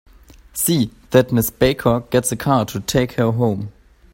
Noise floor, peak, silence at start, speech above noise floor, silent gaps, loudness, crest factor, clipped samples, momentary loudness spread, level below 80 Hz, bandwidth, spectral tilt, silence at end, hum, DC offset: -44 dBFS; 0 dBFS; 0.55 s; 26 dB; none; -18 LUFS; 18 dB; under 0.1%; 5 LU; -42 dBFS; 16.5 kHz; -5 dB/octave; 0.45 s; none; under 0.1%